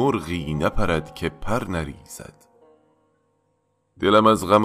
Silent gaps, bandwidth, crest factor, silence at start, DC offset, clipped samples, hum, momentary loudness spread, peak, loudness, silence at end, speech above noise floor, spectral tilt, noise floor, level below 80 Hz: none; 15.5 kHz; 20 dB; 0 s; under 0.1%; under 0.1%; none; 19 LU; -4 dBFS; -22 LUFS; 0 s; 48 dB; -6 dB/octave; -69 dBFS; -38 dBFS